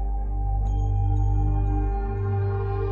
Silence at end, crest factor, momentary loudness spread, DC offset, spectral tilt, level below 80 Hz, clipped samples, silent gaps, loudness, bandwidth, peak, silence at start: 0 s; 8 dB; 4 LU; under 0.1%; -10.5 dB/octave; -26 dBFS; under 0.1%; none; -26 LUFS; 3.1 kHz; -14 dBFS; 0 s